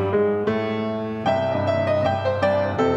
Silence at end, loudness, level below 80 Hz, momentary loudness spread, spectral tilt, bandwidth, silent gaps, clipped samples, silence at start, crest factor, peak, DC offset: 0 s; -22 LUFS; -58 dBFS; 4 LU; -7.5 dB/octave; 8.6 kHz; none; under 0.1%; 0 s; 14 dB; -6 dBFS; under 0.1%